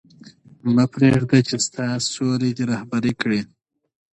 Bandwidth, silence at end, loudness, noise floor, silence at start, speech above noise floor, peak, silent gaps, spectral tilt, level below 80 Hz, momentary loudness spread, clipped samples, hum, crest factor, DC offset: 10.5 kHz; 0.65 s; -20 LUFS; -47 dBFS; 0.25 s; 27 dB; -2 dBFS; none; -5.5 dB/octave; -54 dBFS; 8 LU; under 0.1%; none; 18 dB; under 0.1%